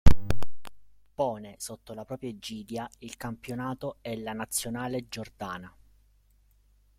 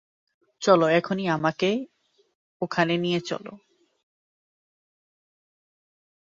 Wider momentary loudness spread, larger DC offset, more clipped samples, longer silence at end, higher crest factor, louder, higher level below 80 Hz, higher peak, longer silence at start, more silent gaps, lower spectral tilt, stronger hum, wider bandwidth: second, 11 LU vs 15 LU; neither; neither; second, 1.3 s vs 2.85 s; about the same, 22 dB vs 24 dB; second, -35 LUFS vs -24 LUFS; first, -38 dBFS vs -70 dBFS; about the same, -4 dBFS vs -4 dBFS; second, 0.05 s vs 0.6 s; second, none vs 2.35-2.60 s; about the same, -5 dB/octave vs -5.5 dB/octave; first, 50 Hz at -60 dBFS vs none; first, 16 kHz vs 7.6 kHz